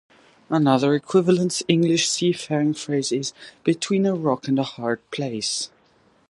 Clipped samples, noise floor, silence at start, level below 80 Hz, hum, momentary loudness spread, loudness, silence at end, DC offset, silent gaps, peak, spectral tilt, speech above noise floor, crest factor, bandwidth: under 0.1%; -59 dBFS; 0.5 s; -68 dBFS; none; 9 LU; -22 LUFS; 0.65 s; under 0.1%; none; -2 dBFS; -5 dB/octave; 38 dB; 20 dB; 11.5 kHz